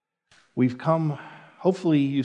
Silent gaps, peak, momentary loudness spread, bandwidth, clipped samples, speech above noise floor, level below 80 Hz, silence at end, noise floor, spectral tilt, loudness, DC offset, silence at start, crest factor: none; -8 dBFS; 15 LU; 9.2 kHz; under 0.1%; 39 dB; -78 dBFS; 0 s; -62 dBFS; -8.5 dB/octave; -24 LUFS; under 0.1%; 0.55 s; 18 dB